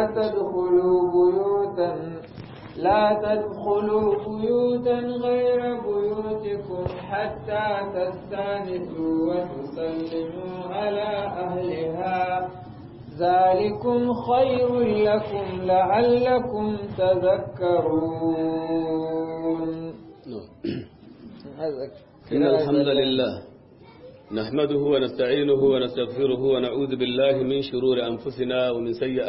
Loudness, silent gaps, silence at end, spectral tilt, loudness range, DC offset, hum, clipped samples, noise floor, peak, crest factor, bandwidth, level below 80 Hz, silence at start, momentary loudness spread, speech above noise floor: -24 LUFS; none; 0 s; -10.5 dB/octave; 6 LU; under 0.1%; none; under 0.1%; -48 dBFS; -8 dBFS; 14 dB; 5.8 kHz; -54 dBFS; 0 s; 12 LU; 25 dB